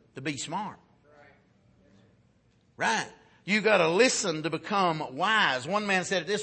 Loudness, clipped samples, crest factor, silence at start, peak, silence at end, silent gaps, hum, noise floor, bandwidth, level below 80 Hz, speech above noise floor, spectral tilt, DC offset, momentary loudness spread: -26 LUFS; under 0.1%; 20 dB; 0.15 s; -8 dBFS; 0 s; none; none; -65 dBFS; 8.8 kHz; -72 dBFS; 38 dB; -3 dB/octave; under 0.1%; 13 LU